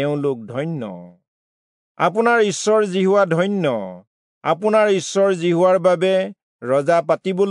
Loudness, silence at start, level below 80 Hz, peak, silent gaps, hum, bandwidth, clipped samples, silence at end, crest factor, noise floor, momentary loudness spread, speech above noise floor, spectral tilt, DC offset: -18 LUFS; 0 s; -76 dBFS; -4 dBFS; 1.28-1.95 s, 4.07-4.41 s, 6.43-6.59 s; none; 11 kHz; under 0.1%; 0 s; 14 dB; under -90 dBFS; 11 LU; over 72 dB; -5.5 dB/octave; under 0.1%